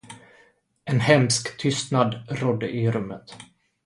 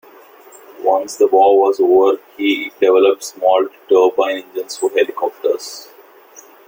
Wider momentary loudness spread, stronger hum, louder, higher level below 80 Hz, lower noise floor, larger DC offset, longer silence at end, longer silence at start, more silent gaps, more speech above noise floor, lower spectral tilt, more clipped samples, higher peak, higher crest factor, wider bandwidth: first, 18 LU vs 9 LU; neither; second, -23 LUFS vs -15 LUFS; first, -58 dBFS vs -64 dBFS; first, -60 dBFS vs -43 dBFS; neither; second, 0.4 s vs 0.9 s; second, 0.05 s vs 0.8 s; neither; first, 37 dB vs 28 dB; first, -5 dB/octave vs -2.5 dB/octave; neither; about the same, -2 dBFS vs -2 dBFS; first, 22 dB vs 14 dB; second, 11.5 kHz vs 17 kHz